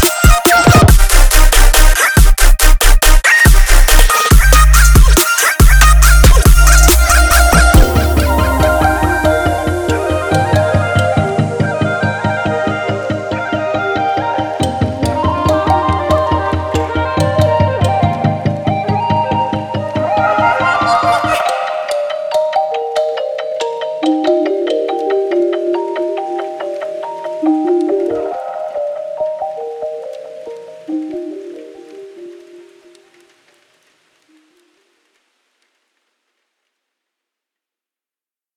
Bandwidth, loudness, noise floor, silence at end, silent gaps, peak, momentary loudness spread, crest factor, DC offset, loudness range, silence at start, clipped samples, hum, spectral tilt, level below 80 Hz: over 20 kHz; -12 LUFS; under -90 dBFS; 6.25 s; none; 0 dBFS; 14 LU; 12 dB; under 0.1%; 13 LU; 0 s; under 0.1%; none; -4.5 dB/octave; -14 dBFS